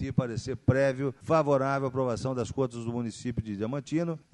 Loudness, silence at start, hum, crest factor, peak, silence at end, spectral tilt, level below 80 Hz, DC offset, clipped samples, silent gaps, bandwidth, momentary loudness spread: -29 LUFS; 0 s; none; 20 dB; -8 dBFS; 0.15 s; -7 dB/octave; -52 dBFS; under 0.1%; under 0.1%; none; 10.5 kHz; 8 LU